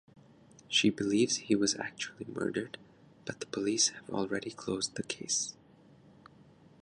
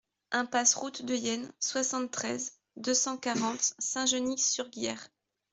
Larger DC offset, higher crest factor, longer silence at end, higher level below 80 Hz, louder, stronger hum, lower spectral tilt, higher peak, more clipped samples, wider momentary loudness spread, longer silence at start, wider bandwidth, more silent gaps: neither; about the same, 20 dB vs 22 dB; first, 1.3 s vs 0.45 s; first, -70 dBFS vs -76 dBFS; about the same, -32 LUFS vs -30 LUFS; neither; first, -2.5 dB/octave vs -1 dB/octave; second, -14 dBFS vs -10 dBFS; neither; about the same, 12 LU vs 10 LU; second, 0.15 s vs 0.3 s; first, 11 kHz vs 8.4 kHz; neither